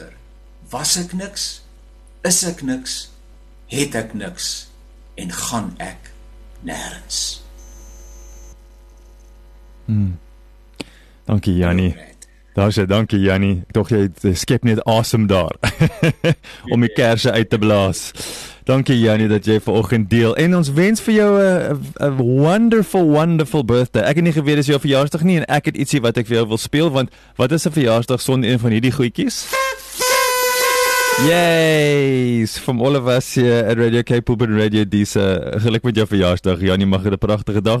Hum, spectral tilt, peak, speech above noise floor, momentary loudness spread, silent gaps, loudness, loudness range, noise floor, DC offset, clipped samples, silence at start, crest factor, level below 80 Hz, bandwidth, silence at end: none; -5 dB/octave; -2 dBFS; 28 dB; 11 LU; none; -16 LUFS; 12 LU; -44 dBFS; under 0.1%; under 0.1%; 0 s; 16 dB; -40 dBFS; 13.5 kHz; 0 s